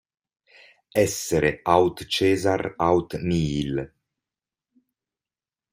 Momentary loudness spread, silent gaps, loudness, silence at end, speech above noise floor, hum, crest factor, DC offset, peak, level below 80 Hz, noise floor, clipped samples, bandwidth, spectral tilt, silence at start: 8 LU; none; -23 LUFS; 1.85 s; over 68 dB; none; 22 dB; under 0.1%; -4 dBFS; -50 dBFS; under -90 dBFS; under 0.1%; 16 kHz; -5 dB/octave; 0.95 s